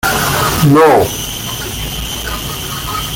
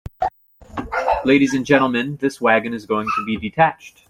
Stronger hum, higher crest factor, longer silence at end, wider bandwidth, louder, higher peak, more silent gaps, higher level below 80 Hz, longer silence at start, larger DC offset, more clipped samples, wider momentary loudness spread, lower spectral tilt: neither; second, 12 dB vs 18 dB; second, 0 s vs 0.2 s; about the same, 17 kHz vs 16.5 kHz; first, -13 LUFS vs -19 LUFS; about the same, 0 dBFS vs -2 dBFS; neither; first, -30 dBFS vs -46 dBFS; about the same, 0.05 s vs 0.05 s; neither; neither; about the same, 12 LU vs 10 LU; second, -4 dB/octave vs -5.5 dB/octave